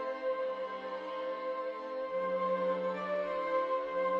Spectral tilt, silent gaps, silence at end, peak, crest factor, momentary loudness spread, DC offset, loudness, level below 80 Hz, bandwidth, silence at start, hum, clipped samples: -6.5 dB/octave; none; 0 s; -22 dBFS; 14 dB; 7 LU; under 0.1%; -35 LUFS; -76 dBFS; 6.2 kHz; 0 s; none; under 0.1%